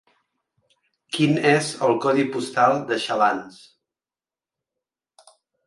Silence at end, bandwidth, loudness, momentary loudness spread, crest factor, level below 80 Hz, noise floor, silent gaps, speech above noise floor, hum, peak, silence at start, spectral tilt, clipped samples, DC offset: 2.15 s; 11.5 kHz; -21 LUFS; 6 LU; 22 dB; -68 dBFS; under -90 dBFS; none; over 69 dB; none; -2 dBFS; 1.1 s; -5 dB/octave; under 0.1%; under 0.1%